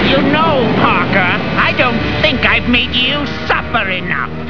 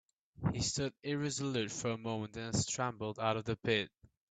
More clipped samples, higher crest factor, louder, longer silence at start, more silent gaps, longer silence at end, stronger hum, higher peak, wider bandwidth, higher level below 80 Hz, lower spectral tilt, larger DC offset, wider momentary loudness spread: neither; second, 14 dB vs 20 dB; first, -12 LUFS vs -37 LUFS; second, 0 s vs 0.4 s; neither; second, 0 s vs 0.45 s; neither; first, 0 dBFS vs -16 dBFS; second, 5.4 kHz vs 9.4 kHz; first, -30 dBFS vs -62 dBFS; first, -6.5 dB/octave vs -4 dB/octave; first, 4% vs under 0.1%; about the same, 5 LU vs 5 LU